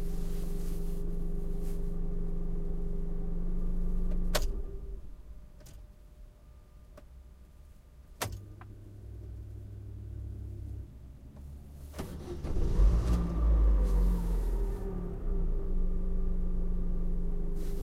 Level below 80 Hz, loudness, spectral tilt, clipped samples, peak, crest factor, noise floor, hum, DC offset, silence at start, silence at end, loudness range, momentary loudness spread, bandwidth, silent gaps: -32 dBFS; -36 LUFS; -6.5 dB/octave; under 0.1%; -14 dBFS; 16 dB; -53 dBFS; none; under 0.1%; 0 s; 0 s; 15 LU; 24 LU; 14.5 kHz; none